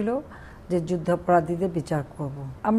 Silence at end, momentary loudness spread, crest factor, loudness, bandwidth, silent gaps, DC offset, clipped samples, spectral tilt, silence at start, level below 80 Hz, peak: 0 s; 12 LU; 18 dB; -26 LUFS; 12.5 kHz; none; under 0.1%; under 0.1%; -8 dB/octave; 0 s; -50 dBFS; -8 dBFS